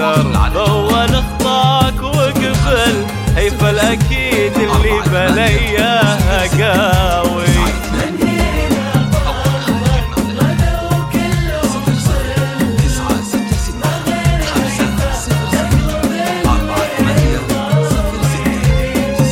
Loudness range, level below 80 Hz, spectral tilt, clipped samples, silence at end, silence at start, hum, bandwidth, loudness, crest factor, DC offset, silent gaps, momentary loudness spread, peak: 3 LU; -20 dBFS; -5.5 dB/octave; under 0.1%; 0 s; 0 s; none; 17 kHz; -14 LUFS; 12 dB; under 0.1%; none; 5 LU; 0 dBFS